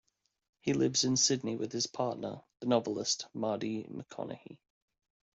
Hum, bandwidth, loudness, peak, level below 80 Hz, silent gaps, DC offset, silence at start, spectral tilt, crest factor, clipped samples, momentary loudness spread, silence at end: none; 8.2 kHz; -33 LUFS; -14 dBFS; -72 dBFS; none; under 0.1%; 0.65 s; -3.5 dB/octave; 20 dB; under 0.1%; 15 LU; 0.8 s